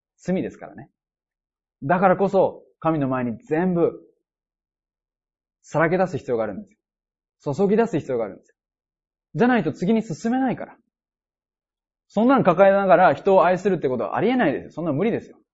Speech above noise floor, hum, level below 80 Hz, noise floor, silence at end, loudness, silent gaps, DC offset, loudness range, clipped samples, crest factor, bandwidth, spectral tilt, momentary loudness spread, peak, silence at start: over 69 dB; none; -60 dBFS; under -90 dBFS; 0.3 s; -21 LUFS; none; under 0.1%; 8 LU; under 0.1%; 18 dB; 8 kHz; -7.5 dB/octave; 14 LU; -4 dBFS; 0.25 s